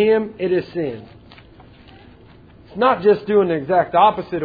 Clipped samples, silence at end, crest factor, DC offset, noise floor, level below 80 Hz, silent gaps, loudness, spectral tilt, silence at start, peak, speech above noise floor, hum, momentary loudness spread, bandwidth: under 0.1%; 0 s; 18 dB; under 0.1%; -45 dBFS; -52 dBFS; none; -18 LUFS; -9 dB/octave; 0 s; -2 dBFS; 28 dB; none; 12 LU; 5 kHz